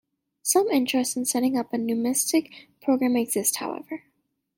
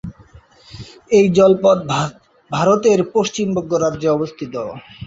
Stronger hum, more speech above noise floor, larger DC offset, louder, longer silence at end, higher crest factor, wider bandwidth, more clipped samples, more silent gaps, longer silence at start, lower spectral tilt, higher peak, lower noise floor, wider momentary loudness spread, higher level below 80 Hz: neither; first, 49 dB vs 30 dB; neither; second, -24 LUFS vs -16 LUFS; first, 0.6 s vs 0 s; about the same, 18 dB vs 16 dB; first, 17 kHz vs 8 kHz; neither; neither; first, 0.45 s vs 0.05 s; second, -2.5 dB/octave vs -6 dB/octave; second, -6 dBFS vs -2 dBFS; first, -73 dBFS vs -46 dBFS; second, 10 LU vs 17 LU; second, -70 dBFS vs -50 dBFS